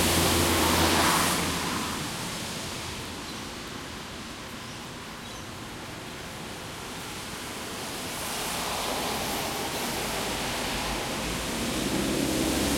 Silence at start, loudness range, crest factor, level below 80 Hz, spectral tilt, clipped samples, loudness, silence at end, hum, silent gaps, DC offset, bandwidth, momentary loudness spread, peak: 0 s; 11 LU; 20 dB; -46 dBFS; -3 dB/octave; under 0.1%; -29 LUFS; 0 s; none; none; under 0.1%; 16.5 kHz; 16 LU; -8 dBFS